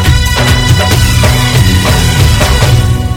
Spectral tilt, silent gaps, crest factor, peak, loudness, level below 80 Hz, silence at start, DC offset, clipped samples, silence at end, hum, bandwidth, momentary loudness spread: -4.5 dB/octave; none; 8 dB; 0 dBFS; -8 LUFS; -14 dBFS; 0 s; under 0.1%; 1%; 0 s; none; 18.5 kHz; 1 LU